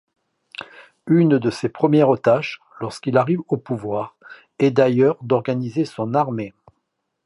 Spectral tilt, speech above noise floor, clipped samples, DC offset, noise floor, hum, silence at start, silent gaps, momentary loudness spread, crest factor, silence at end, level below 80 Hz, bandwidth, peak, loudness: -8 dB/octave; 56 dB; under 0.1%; under 0.1%; -75 dBFS; none; 0.6 s; none; 19 LU; 18 dB; 0.75 s; -62 dBFS; 11.5 kHz; -2 dBFS; -19 LUFS